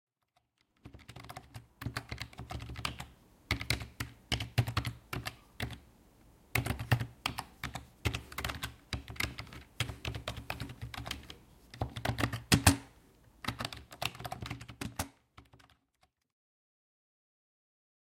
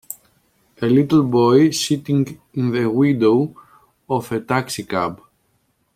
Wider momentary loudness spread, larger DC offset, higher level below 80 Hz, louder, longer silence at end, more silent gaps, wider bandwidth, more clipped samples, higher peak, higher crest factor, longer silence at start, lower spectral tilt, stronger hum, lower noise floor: first, 16 LU vs 11 LU; neither; first, -52 dBFS vs -58 dBFS; second, -37 LUFS vs -18 LUFS; first, 2.45 s vs 0.8 s; neither; about the same, 16.5 kHz vs 16 kHz; neither; second, -6 dBFS vs -2 dBFS; first, 32 dB vs 16 dB; first, 0.85 s vs 0.1 s; second, -4 dB/octave vs -6 dB/octave; neither; first, -78 dBFS vs -65 dBFS